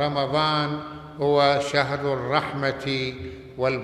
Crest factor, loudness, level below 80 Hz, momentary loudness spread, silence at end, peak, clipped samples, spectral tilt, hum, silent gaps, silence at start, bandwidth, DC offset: 18 dB; -24 LUFS; -52 dBFS; 12 LU; 0 s; -6 dBFS; under 0.1%; -5.5 dB/octave; none; none; 0 s; 12 kHz; under 0.1%